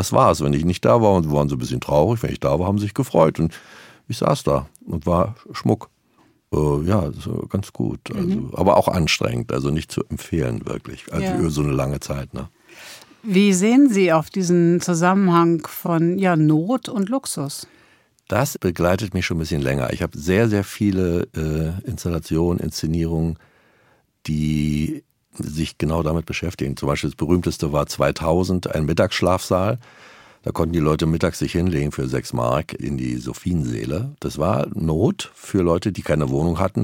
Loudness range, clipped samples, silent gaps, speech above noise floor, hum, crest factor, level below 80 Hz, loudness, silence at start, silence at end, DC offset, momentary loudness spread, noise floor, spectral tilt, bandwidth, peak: 6 LU; under 0.1%; none; 39 dB; none; 20 dB; -42 dBFS; -21 LUFS; 0 s; 0 s; under 0.1%; 11 LU; -59 dBFS; -6.5 dB/octave; 17 kHz; -2 dBFS